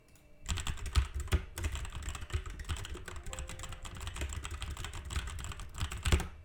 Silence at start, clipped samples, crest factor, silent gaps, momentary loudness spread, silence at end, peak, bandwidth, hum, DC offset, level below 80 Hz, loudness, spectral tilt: 0.05 s; under 0.1%; 24 dB; none; 10 LU; 0 s; -14 dBFS; 18 kHz; none; under 0.1%; -40 dBFS; -39 LUFS; -4 dB/octave